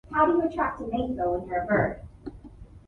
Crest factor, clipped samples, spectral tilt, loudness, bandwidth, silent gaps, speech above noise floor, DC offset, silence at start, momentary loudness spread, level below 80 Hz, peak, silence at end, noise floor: 18 dB; under 0.1%; -9 dB/octave; -26 LUFS; 4.5 kHz; none; 21 dB; under 0.1%; 0.1 s; 20 LU; -46 dBFS; -10 dBFS; 0.1 s; -47 dBFS